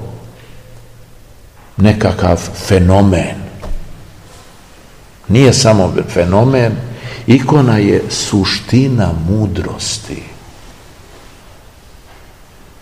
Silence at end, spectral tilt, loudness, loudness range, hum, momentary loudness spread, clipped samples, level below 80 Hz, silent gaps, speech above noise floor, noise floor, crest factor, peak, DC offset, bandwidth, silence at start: 2.1 s; -6 dB/octave; -12 LUFS; 8 LU; none; 20 LU; 0.6%; -32 dBFS; none; 29 dB; -40 dBFS; 14 dB; 0 dBFS; 0.5%; 15.5 kHz; 0 s